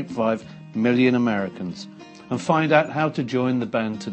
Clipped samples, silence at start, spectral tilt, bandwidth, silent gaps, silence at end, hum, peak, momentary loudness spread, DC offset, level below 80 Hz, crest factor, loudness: under 0.1%; 0 s; -6.5 dB/octave; 8.6 kHz; none; 0 s; none; -2 dBFS; 14 LU; under 0.1%; -64 dBFS; 20 dB; -22 LUFS